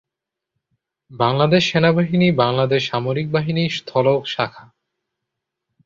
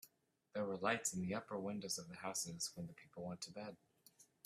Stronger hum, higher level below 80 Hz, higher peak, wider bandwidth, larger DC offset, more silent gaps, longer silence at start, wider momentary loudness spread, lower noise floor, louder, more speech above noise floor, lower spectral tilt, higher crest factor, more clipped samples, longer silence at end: neither; first, -56 dBFS vs -80 dBFS; first, -2 dBFS vs -22 dBFS; second, 7.4 kHz vs 15.5 kHz; neither; neither; first, 1.1 s vs 0.05 s; second, 6 LU vs 14 LU; first, -84 dBFS vs -77 dBFS; first, -18 LUFS vs -44 LUFS; first, 66 dB vs 32 dB; first, -6.5 dB/octave vs -3.5 dB/octave; second, 18 dB vs 24 dB; neither; first, 1.25 s vs 0.2 s